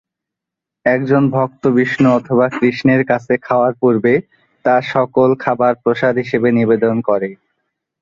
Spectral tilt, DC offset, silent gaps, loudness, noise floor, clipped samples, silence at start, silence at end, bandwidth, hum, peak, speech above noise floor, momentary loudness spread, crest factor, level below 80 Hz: -8.5 dB/octave; under 0.1%; none; -15 LUFS; -83 dBFS; under 0.1%; 0.85 s; 0.65 s; 7.2 kHz; none; 0 dBFS; 69 dB; 4 LU; 14 dB; -56 dBFS